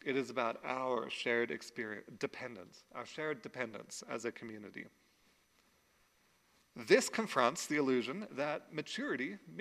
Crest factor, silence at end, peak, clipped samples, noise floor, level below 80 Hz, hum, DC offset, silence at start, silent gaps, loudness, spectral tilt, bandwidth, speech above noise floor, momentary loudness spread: 26 dB; 0 s; -12 dBFS; under 0.1%; -72 dBFS; -84 dBFS; none; under 0.1%; 0.05 s; none; -37 LUFS; -3.5 dB/octave; 15.5 kHz; 35 dB; 16 LU